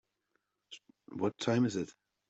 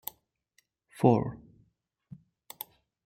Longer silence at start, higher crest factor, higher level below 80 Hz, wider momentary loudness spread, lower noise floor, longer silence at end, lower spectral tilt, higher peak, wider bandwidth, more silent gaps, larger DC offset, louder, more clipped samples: second, 0.7 s vs 1 s; second, 20 dB vs 26 dB; second, -74 dBFS vs -64 dBFS; second, 22 LU vs 25 LU; first, -81 dBFS vs -73 dBFS; second, 0.4 s vs 1.7 s; second, -6 dB/octave vs -8 dB/octave; second, -18 dBFS vs -8 dBFS; second, 8.2 kHz vs 16.5 kHz; neither; neither; second, -34 LUFS vs -27 LUFS; neither